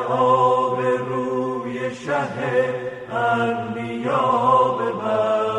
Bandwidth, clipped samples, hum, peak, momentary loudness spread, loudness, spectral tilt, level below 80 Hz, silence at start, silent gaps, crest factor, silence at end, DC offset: 10 kHz; under 0.1%; none; -6 dBFS; 10 LU; -21 LUFS; -6.5 dB/octave; -62 dBFS; 0 s; none; 14 dB; 0 s; under 0.1%